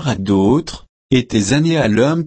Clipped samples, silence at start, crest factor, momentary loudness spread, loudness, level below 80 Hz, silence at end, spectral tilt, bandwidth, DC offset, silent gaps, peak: under 0.1%; 0 s; 14 dB; 7 LU; -15 LUFS; -40 dBFS; 0 s; -6 dB/octave; 8.8 kHz; under 0.1%; 0.89-1.09 s; -2 dBFS